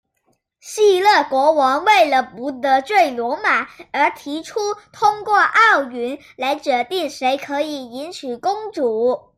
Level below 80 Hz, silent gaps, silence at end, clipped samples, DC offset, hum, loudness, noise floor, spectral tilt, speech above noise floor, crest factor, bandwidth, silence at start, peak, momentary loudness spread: -66 dBFS; none; 0.2 s; under 0.1%; under 0.1%; none; -17 LUFS; -66 dBFS; -2 dB/octave; 49 dB; 16 dB; 15.5 kHz; 0.65 s; -2 dBFS; 13 LU